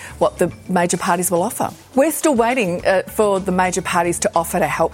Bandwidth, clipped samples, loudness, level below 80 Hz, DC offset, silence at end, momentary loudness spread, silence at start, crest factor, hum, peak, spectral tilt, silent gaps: 17 kHz; under 0.1%; -18 LUFS; -46 dBFS; under 0.1%; 0 s; 4 LU; 0 s; 16 dB; none; -2 dBFS; -4.5 dB/octave; none